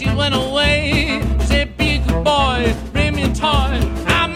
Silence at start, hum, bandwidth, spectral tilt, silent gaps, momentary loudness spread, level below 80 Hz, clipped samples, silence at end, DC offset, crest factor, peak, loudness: 0 s; none; 15 kHz; -5 dB/octave; none; 4 LU; -22 dBFS; under 0.1%; 0 s; under 0.1%; 14 dB; -2 dBFS; -17 LUFS